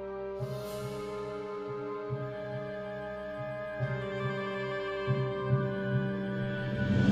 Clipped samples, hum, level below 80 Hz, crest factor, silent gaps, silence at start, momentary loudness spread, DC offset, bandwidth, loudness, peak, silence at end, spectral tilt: under 0.1%; none; -56 dBFS; 18 dB; none; 0 s; 8 LU; under 0.1%; 14.5 kHz; -35 LUFS; -14 dBFS; 0 s; -7.5 dB/octave